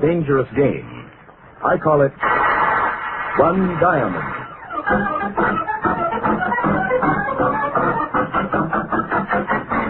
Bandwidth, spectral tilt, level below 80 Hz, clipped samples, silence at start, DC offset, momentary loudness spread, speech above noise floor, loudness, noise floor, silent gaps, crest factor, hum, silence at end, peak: 4.4 kHz; -12 dB/octave; -44 dBFS; under 0.1%; 0 s; under 0.1%; 7 LU; 26 dB; -19 LUFS; -44 dBFS; none; 18 dB; none; 0 s; -2 dBFS